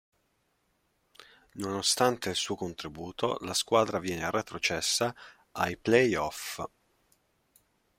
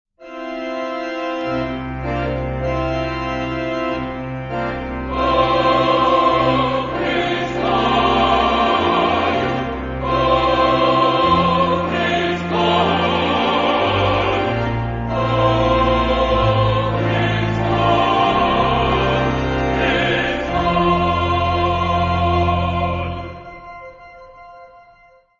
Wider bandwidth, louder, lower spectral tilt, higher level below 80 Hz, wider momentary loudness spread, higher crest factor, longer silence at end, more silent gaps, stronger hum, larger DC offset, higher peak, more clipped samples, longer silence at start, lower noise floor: first, 16.5 kHz vs 7.6 kHz; second, -29 LUFS vs -18 LUFS; second, -3 dB/octave vs -6.5 dB/octave; second, -64 dBFS vs -32 dBFS; first, 15 LU vs 9 LU; first, 24 dB vs 14 dB; first, 1.3 s vs 0.75 s; neither; neither; neither; second, -8 dBFS vs -2 dBFS; neither; first, 1.55 s vs 0.2 s; first, -74 dBFS vs -50 dBFS